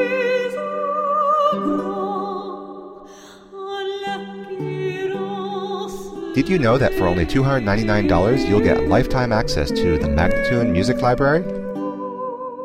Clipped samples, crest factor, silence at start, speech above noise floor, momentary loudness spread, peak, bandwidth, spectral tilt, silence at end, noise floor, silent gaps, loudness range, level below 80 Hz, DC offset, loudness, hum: under 0.1%; 16 dB; 0 s; 25 dB; 13 LU; -4 dBFS; 16 kHz; -6.5 dB/octave; 0 s; -42 dBFS; none; 10 LU; -34 dBFS; under 0.1%; -20 LUFS; none